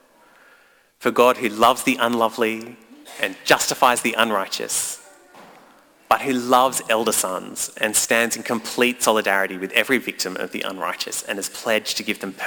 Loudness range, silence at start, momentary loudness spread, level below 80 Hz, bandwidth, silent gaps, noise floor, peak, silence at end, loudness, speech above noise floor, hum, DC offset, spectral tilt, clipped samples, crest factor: 2 LU; 1 s; 9 LU; -62 dBFS; 19.5 kHz; none; -55 dBFS; -2 dBFS; 0 s; -20 LUFS; 34 dB; none; under 0.1%; -2 dB/octave; under 0.1%; 20 dB